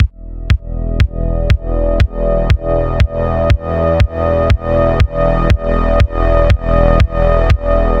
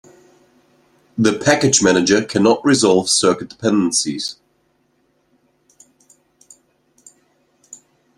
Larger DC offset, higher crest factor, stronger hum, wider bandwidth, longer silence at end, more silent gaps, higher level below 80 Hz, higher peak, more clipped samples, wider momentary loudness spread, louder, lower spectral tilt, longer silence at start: first, 1% vs under 0.1%; second, 12 dB vs 18 dB; neither; second, 7.8 kHz vs 13 kHz; second, 0 s vs 0.4 s; neither; first, -16 dBFS vs -58 dBFS; about the same, 0 dBFS vs 0 dBFS; neither; second, 5 LU vs 9 LU; about the same, -14 LUFS vs -15 LUFS; first, -8 dB/octave vs -3.5 dB/octave; second, 0 s vs 1.15 s